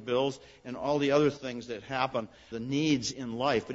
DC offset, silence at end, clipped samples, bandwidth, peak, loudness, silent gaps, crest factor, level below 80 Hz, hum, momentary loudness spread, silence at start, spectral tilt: under 0.1%; 0 s; under 0.1%; 8 kHz; -12 dBFS; -30 LUFS; none; 20 dB; -62 dBFS; none; 13 LU; 0 s; -5 dB/octave